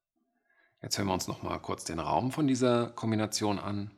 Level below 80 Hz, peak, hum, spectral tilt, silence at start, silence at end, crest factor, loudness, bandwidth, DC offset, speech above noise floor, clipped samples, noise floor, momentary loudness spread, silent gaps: -64 dBFS; -14 dBFS; none; -5 dB/octave; 0.85 s; 0.05 s; 18 dB; -31 LUFS; 15.5 kHz; under 0.1%; 48 dB; under 0.1%; -78 dBFS; 9 LU; none